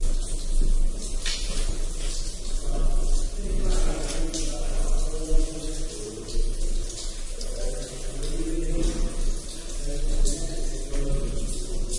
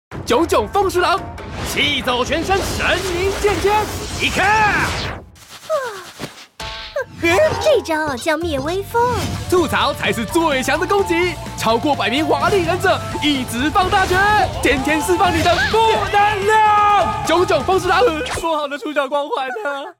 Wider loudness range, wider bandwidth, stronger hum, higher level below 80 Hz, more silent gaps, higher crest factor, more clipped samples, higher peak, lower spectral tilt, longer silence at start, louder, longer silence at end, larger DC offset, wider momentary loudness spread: second, 2 LU vs 5 LU; second, 11.5 kHz vs 17.5 kHz; neither; first, -24 dBFS vs -36 dBFS; neither; about the same, 16 dB vs 12 dB; neither; about the same, -8 dBFS vs -6 dBFS; about the same, -4 dB/octave vs -4 dB/octave; about the same, 0 s vs 0.1 s; second, -31 LUFS vs -17 LUFS; about the same, 0 s vs 0.1 s; first, 0.6% vs under 0.1%; second, 5 LU vs 9 LU